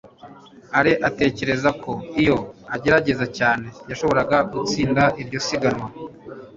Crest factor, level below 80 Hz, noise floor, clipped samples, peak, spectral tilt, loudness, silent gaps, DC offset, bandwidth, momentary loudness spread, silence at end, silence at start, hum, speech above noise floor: 20 dB; -48 dBFS; -44 dBFS; under 0.1%; -2 dBFS; -5.5 dB/octave; -21 LUFS; none; under 0.1%; 7.8 kHz; 12 LU; 0.05 s; 0.05 s; none; 24 dB